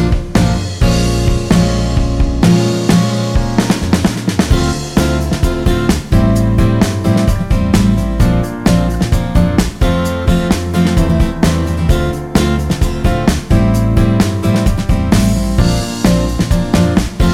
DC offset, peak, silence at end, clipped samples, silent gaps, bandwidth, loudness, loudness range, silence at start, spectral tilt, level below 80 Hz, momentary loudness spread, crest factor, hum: under 0.1%; 0 dBFS; 0 s; under 0.1%; none; 16 kHz; -13 LUFS; 1 LU; 0 s; -6 dB/octave; -18 dBFS; 3 LU; 12 dB; none